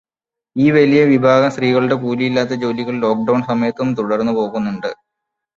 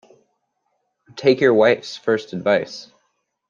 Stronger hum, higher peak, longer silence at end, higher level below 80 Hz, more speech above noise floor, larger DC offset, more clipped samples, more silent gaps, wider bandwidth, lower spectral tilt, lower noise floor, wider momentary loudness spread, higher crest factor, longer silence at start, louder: neither; about the same, -2 dBFS vs -2 dBFS; about the same, 0.65 s vs 0.65 s; first, -58 dBFS vs -66 dBFS; first, 72 dB vs 54 dB; neither; neither; neither; about the same, 7.6 kHz vs 7.4 kHz; first, -7 dB/octave vs -5.5 dB/octave; first, -87 dBFS vs -72 dBFS; second, 9 LU vs 19 LU; about the same, 14 dB vs 18 dB; second, 0.55 s vs 1.15 s; about the same, -16 LUFS vs -18 LUFS